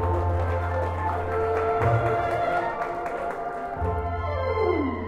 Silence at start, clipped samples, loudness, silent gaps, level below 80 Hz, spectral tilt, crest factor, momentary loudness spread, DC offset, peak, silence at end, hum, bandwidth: 0 s; under 0.1%; -26 LUFS; none; -38 dBFS; -8 dB/octave; 14 dB; 7 LU; under 0.1%; -10 dBFS; 0 s; none; 8.4 kHz